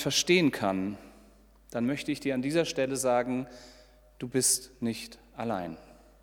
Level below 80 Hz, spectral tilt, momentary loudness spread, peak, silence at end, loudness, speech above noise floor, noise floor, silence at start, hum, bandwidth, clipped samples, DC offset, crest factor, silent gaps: -60 dBFS; -3.5 dB/octave; 18 LU; -10 dBFS; 0.35 s; -29 LUFS; 28 dB; -58 dBFS; 0 s; none; 18.5 kHz; under 0.1%; under 0.1%; 20 dB; none